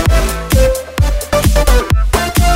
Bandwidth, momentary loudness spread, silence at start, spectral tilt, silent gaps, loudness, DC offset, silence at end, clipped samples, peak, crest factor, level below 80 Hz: 16.5 kHz; 4 LU; 0 s; -5 dB/octave; none; -13 LUFS; under 0.1%; 0 s; 0.1%; 0 dBFS; 12 dB; -14 dBFS